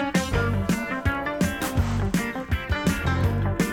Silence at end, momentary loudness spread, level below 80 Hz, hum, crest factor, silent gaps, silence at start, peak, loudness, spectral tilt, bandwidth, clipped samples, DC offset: 0 s; 3 LU; -34 dBFS; none; 14 dB; none; 0 s; -10 dBFS; -25 LUFS; -5.5 dB/octave; 18.5 kHz; under 0.1%; under 0.1%